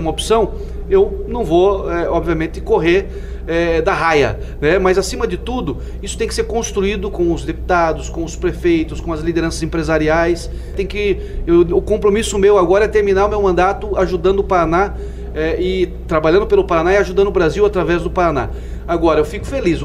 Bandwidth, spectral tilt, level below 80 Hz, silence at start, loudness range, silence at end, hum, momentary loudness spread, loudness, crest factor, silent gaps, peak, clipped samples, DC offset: 14 kHz; -5.5 dB/octave; -26 dBFS; 0 s; 4 LU; 0 s; none; 9 LU; -16 LUFS; 14 dB; none; -2 dBFS; under 0.1%; under 0.1%